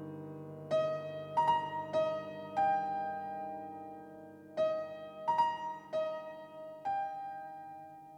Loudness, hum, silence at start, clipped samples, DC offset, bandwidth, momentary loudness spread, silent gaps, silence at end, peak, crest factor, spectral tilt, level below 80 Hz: -36 LUFS; 50 Hz at -80 dBFS; 0 s; under 0.1%; under 0.1%; 9.8 kHz; 16 LU; none; 0 s; -20 dBFS; 16 dB; -6 dB/octave; -80 dBFS